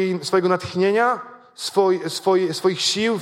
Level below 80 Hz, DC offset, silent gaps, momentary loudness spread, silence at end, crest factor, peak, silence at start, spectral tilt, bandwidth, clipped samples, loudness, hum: -62 dBFS; under 0.1%; none; 6 LU; 0 s; 14 dB; -6 dBFS; 0 s; -4 dB/octave; 16 kHz; under 0.1%; -20 LUFS; none